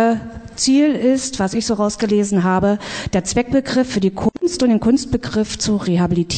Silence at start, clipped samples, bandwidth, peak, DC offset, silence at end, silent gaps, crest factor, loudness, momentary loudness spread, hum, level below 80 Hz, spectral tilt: 0 s; under 0.1%; 9.2 kHz; -4 dBFS; under 0.1%; 0 s; none; 12 dB; -17 LUFS; 6 LU; none; -40 dBFS; -5 dB/octave